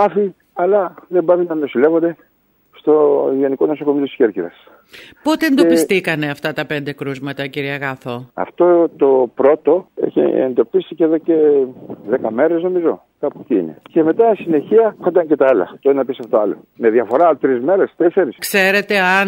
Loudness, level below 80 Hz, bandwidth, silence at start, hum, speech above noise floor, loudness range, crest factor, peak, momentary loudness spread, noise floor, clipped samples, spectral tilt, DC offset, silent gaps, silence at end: -16 LUFS; -66 dBFS; 16 kHz; 0 s; none; 38 dB; 3 LU; 14 dB; 0 dBFS; 10 LU; -53 dBFS; under 0.1%; -5.5 dB/octave; under 0.1%; none; 0 s